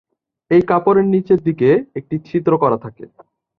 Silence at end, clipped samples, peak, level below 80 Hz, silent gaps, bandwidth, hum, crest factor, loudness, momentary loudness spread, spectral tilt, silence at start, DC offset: 0.55 s; under 0.1%; -2 dBFS; -54 dBFS; none; 5.2 kHz; none; 16 dB; -16 LUFS; 11 LU; -10.5 dB/octave; 0.5 s; under 0.1%